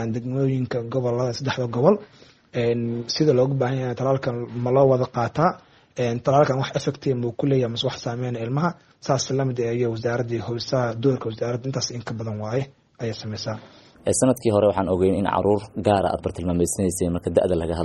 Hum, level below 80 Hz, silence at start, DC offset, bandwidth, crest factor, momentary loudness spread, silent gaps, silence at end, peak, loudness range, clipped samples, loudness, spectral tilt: none; -54 dBFS; 0 s; under 0.1%; 11 kHz; 20 dB; 10 LU; none; 0 s; -2 dBFS; 4 LU; under 0.1%; -23 LUFS; -6 dB/octave